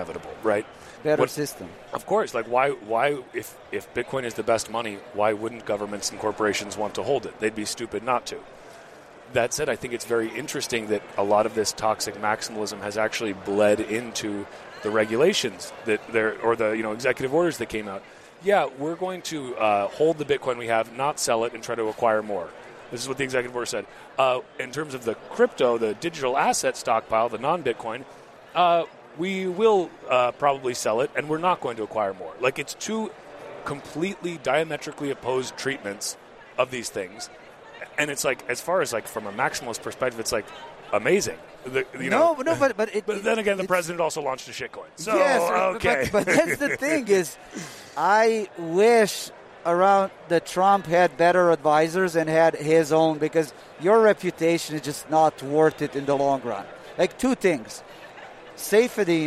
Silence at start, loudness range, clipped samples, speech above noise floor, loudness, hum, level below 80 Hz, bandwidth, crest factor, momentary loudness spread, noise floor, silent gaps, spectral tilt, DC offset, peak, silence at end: 0 s; 7 LU; under 0.1%; 22 dB; -24 LUFS; none; -60 dBFS; 15 kHz; 18 dB; 13 LU; -46 dBFS; none; -4 dB/octave; under 0.1%; -6 dBFS; 0 s